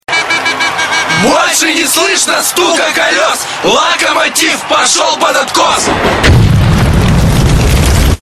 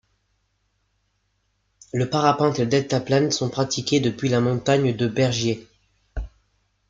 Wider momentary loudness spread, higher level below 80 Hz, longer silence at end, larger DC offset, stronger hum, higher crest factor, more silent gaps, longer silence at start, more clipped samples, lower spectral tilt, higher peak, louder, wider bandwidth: second, 3 LU vs 15 LU; first, -18 dBFS vs -44 dBFS; second, 0.05 s vs 0.6 s; neither; second, none vs 50 Hz at -50 dBFS; second, 8 dB vs 20 dB; neither; second, 0.1 s vs 1.95 s; first, 0.3% vs under 0.1%; second, -3.5 dB/octave vs -5.5 dB/octave; first, 0 dBFS vs -4 dBFS; first, -8 LUFS vs -22 LUFS; first, 15.5 kHz vs 7.8 kHz